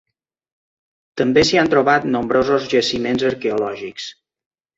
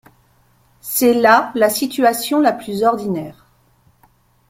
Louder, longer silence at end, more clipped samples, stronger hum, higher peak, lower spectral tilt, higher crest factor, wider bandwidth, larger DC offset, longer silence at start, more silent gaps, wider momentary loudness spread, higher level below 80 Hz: about the same, -17 LUFS vs -16 LUFS; second, 0.65 s vs 1.2 s; neither; neither; about the same, -2 dBFS vs -2 dBFS; about the same, -4.5 dB/octave vs -3.5 dB/octave; about the same, 18 dB vs 16 dB; second, 8 kHz vs 16.5 kHz; neither; first, 1.15 s vs 0.85 s; neither; first, 15 LU vs 12 LU; first, -50 dBFS vs -58 dBFS